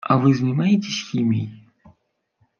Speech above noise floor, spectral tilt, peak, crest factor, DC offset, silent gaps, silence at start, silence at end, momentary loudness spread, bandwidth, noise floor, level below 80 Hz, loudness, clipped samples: 49 dB; -6.5 dB/octave; -2 dBFS; 20 dB; under 0.1%; none; 0.05 s; 1 s; 8 LU; 7 kHz; -68 dBFS; -64 dBFS; -20 LUFS; under 0.1%